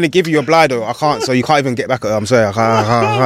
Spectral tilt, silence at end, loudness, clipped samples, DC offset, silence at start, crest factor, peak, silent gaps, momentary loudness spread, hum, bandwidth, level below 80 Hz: -5.5 dB/octave; 0 s; -14 LUFS; under 0.1%; under 0.1%; 0 s; 12 dB; 0 dBFS; none; 5 LU; none; 16 kHz; -48 dBFS